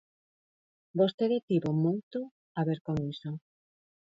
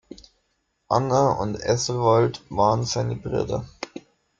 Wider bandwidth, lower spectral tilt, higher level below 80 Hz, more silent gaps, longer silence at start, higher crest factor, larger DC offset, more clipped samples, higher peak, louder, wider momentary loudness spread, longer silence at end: second, 7.6 kHz vs 8.8 kHz; first, -9 dB/octave vs -5.5 dB/octave; second, -64 dBFS vs -50 dBFS; first, 1.14-1.18 s, 1.43-1.48 s, 2.03-2.11 s, 2.31-2.55 s, 2.81-2.85 s vs none; first, 0.95 s vs 0.1 s; about the same, 20 dB vs 18 dB; neither; neither; second, -14 dBFS vs -4 dBFS; second, -31 LUFS vs -23 LUFS; second, 12 LU vs 15 LU; first, 0.75 s vs 0.4 s